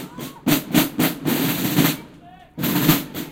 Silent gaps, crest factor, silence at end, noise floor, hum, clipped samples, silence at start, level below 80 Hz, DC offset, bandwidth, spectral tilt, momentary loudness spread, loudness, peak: none; 20 dB; 0 s; -45 dBFS; none; under 0.1%; 0 s; -50 dBFS; under 0.1%; 17 kHz; -4.5 dB/octave; 10 LU; -20 LUFS; -2 dBFS